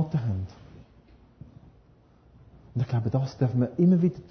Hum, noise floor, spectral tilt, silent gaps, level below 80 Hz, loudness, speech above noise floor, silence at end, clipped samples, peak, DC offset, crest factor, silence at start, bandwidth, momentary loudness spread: none; -58 dBFS; -10 dB/octave; none; -50 dBFS; -26 LUFS; 34 dB; 0.1 s; under 0.1%; -12 dBFS; under 0.1%; 16 dB; 0 s; 6.4 kHz; 13 LU